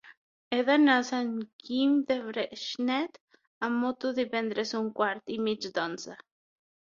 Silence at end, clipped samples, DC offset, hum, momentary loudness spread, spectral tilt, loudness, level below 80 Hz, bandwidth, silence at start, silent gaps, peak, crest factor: 0.7 s; under 0.1%; under 0.1%; none; 11 LU; -4 dB/octave; -29 LUFS; -76 dBFS; 7.4 kHz; 0.05 s; 0.17-0.51 s, 1.53-1.59 s, 3.20-3.28 s, 3.47-3.61 s; -10 dBFS; 20 dB